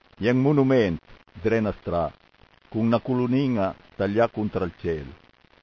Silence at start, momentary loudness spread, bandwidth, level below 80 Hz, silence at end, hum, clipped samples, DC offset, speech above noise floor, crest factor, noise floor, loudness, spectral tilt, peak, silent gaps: 0.2 s; 11 LU; 6.6 kHz; -48 dBFS; 0.5 s; none; under 0.1%; under 0.1%; 33 dB; 18 dB; -57 dBFS; -24 LUFS; -8.5 dB/octave; -6 dBFS; none